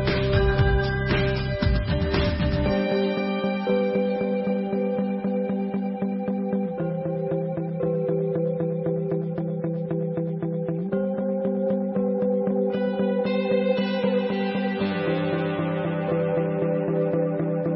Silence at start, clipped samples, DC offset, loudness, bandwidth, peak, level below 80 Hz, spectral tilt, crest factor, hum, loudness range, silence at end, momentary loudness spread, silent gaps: 0 s; under 0.1%; under 0.1%; -25 LUFS; 5.8 kHz; -8 dBFS; -36 dBFS; -11.5 dB/octave; 16 dB; none; 3 LU; 0 s; 5 LU; none